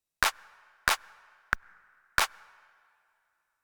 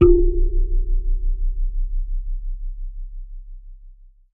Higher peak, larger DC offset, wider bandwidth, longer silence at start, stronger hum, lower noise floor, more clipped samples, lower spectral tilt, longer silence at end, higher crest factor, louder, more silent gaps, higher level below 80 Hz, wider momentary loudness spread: about the same, -4 dBFS vs -2 dBFS; neither; first, over 20 kHz vs 2.7 kHz; first, 0.2 s vs 0 s; neither; first, -77 dBFS vs -44 dBFS; neither; second, 0 dB/octave vs -12.5 dB/octave; first, 1.35 s vs 0.4 s; first, 30 dB vs 18 dB; second, -30 LUFS vs -25 LUFS; neither; second, -54 dBFS vs -20 dBFS; second, 5 LU vs 19 LU